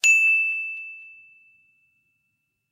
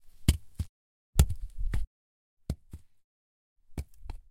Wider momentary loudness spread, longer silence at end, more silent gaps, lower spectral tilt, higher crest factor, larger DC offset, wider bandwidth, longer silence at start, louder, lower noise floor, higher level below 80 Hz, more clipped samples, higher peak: first, 23 LU vs 20 LU; first, 1.6 s vs 0.15 s; second, none vs 0.69-1.13 s, 1.87-2.37 s, 3.04-3.56 s; second, 5 dB/octave vs -5 dB/octave; second, 20 dB vs 28 dB; neither; about the same, 16 kHz vs 16.5 kHz; about the same, 0.05 s vs 0 s; first, -19 LUFS vs -34 LUFS; first, -76 dBFS vs -51 dBFS; second, -88 dBFS vs -36 dBFS; neither; about the same, -6 dBFS vs -6 dBFS